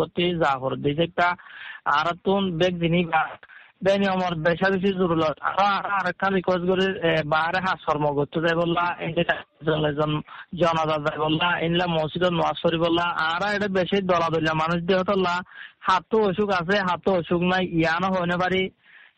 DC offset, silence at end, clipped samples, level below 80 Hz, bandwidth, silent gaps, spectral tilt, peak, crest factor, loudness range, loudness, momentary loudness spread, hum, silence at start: under 0.1%; 0.2 s; under 0.1%; -52 dBFS; 8.6 kHz; none; -6.5 dB/octave; -6 dBFS; 16 dB; 1 LU; -23 LUFS; 4 LU; none; 0 s